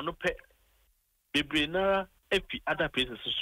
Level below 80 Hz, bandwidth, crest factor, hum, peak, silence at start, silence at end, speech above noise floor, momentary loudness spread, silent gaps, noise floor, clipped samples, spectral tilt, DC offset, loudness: -54 dBFS; 16 kHz; 16 dB; none; -16 dBFS; 0 s; 0 s; 41 dB; 6 LU; none; -72 dBFS; under 0.1%; -4 dB/octave; under 0.1%; -30 LUFS